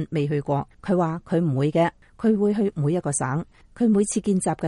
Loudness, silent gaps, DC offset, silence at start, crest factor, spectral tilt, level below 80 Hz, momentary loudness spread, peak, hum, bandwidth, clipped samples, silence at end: -23 LUFS; none; under 0.1%; 0 s; 14 dB; -6.5 dB/octave; -54 dBFS; 6 LU; -8 dBFS; none; 11.5 kHz; under 0.1%; 0 s